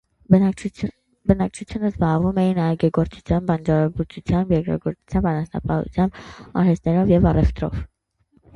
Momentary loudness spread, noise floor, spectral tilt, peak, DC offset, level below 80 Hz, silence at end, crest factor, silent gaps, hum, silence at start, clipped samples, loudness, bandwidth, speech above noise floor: 11 LU; -62 dBFS; -9 dB/octave; -2 dBFS; under 0.1%; -34 dBFS; 0.7 s; 18 dB; none; none; 0.3 s; under 0.1%; -21 LUFS; 9.2 kHz; 42 dB